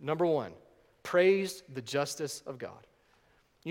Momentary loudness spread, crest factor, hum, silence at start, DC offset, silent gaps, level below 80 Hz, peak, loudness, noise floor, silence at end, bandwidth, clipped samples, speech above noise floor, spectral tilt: 19 LU; 18 dB; none; 0 s; under 0.1%; none; -74 dBFS; -14 dBFS; -31 LUFS; -67 dBFS; 0 s; 16.5 kHz; under 0.1%; 37 dB; -4.5 dB/octave